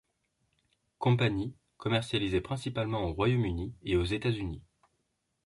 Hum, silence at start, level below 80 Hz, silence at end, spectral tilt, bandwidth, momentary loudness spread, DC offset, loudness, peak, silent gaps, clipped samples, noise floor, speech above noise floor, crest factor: none; 1 s; -48 dBFS; 0.85 s; -7 dB/octave; 11.5 kHz; 10 LU; under 0.1%; -31 LUFS; -12 dBFS; none; under 0.1%; -79 dBFS; 49 dB; 20 dB